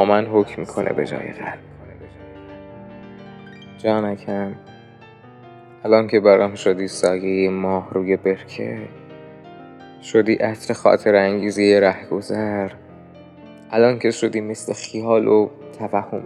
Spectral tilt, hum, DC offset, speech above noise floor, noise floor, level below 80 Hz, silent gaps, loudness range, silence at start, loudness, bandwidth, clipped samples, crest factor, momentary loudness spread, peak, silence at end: -5.5 dB/octave; none; under 0.1%; 26 dB; -44 dBFS; -60 dBFS; none; 10 LU; 0 s; -19 LUFS; 11.5 kHz; under 0.1%; 20 dB; 25 LU; 0 dBFS; 0 s